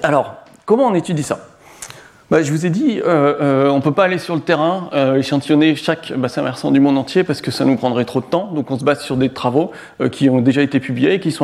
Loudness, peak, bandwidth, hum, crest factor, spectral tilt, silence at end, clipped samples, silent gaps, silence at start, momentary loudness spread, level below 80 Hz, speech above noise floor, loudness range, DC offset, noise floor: -16 LUFS; 0 dBFS; 13 kHz; none; 16 dB; -6.5 dB/octave; 0 s; under 0.1%; none; 0 s; 8 LU; -56 dBFS; 21 dB; 2 LU; under 0.1%; -37 dBFS